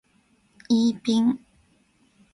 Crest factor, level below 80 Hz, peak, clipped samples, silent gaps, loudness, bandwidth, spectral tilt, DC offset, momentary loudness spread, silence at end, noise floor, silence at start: 16 dB; -66 dBFS; -12 dBFS; under 0.1%; none; -23 LUFS; 11.5 kHz; -5.5 dB/octave; under 0.1%; 4 LU; 0.95 s; -64 dBFS; 0.7 s